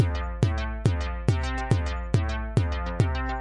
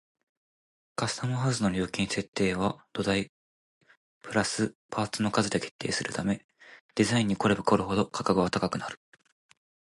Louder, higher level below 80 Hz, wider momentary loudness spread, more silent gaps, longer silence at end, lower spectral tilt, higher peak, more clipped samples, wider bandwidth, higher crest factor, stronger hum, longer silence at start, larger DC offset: about the same, -27 LUFS vs -29 LUFS; first, -32 dBFS vs -56 dBFS; second, 1 LU vs 9 LU; second, none vs 2.28-2.33 s, 3.29-3.81 s, 3.97-4.21 s, 4.75-4.89 s, 5.71-5.79 s, 6.44-6.49 s, 6.81-6.89 s; second, 0 s vs 1.05 s; first, -7 dB/octave vs -5 dB/octave; about the same, -8 dBFS vs -8 dBFS; neither; about the same, 11 kHz vs 11.5 kHz; about the same, 18 dB vs 22 dB; neither; second, 0 s vs 1 s; first, 0.1% vs under 0.1%